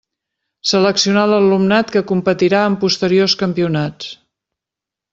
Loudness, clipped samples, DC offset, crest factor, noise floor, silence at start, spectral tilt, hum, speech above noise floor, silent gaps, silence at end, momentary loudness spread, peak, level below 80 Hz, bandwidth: -15 LUFS; under 0.1%; under 0.1%; 14 dB; -86 dBFS; 0.65 s; -5 dB/octave; none; 71 dB; none; 1 s; 8 LU; -2 dBFS; -56 dBFS; 7.8 kHz